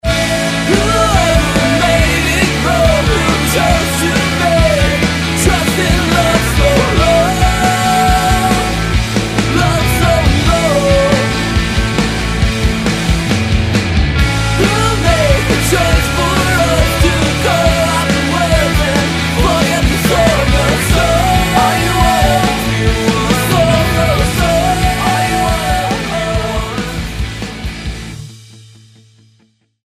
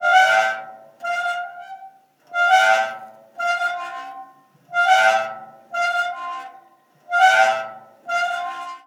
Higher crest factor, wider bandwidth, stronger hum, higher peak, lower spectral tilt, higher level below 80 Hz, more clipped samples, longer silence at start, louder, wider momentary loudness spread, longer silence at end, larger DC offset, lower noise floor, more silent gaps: second, 12 dB vs 18 dB; about the same, 15.5 kHz vs 16 kHz; neither; first, 0 dBFS vs -4 dBFS; first, -4.5 dB/octave vs 0.5 dB/octave; first, -20 dBFS vs under -90 dBFS; neither; about the same, 0.05 s vs 0 s; first, -12 LUFS vs -19 LUFS; second, 4 LU vs 23 LU; first, 1.25 s vs 0.1 s; neither; about the same, -54 dBFS vs -53 dBFS; neither